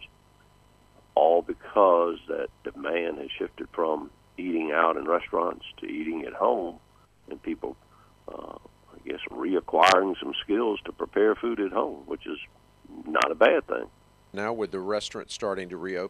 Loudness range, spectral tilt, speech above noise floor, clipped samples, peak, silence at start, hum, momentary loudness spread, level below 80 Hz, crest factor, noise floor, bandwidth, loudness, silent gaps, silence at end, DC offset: 8 LU; -4 dB/octave; 32 dB; under 0.1%; -6 dBFS; 0 s; 50 Hz at -60 dBFS; 18 LU; -60 dBFS; 22 dB; -59 dBFS; 12.5 kHz; -27 LUFS; none; 0 s; under 0.1%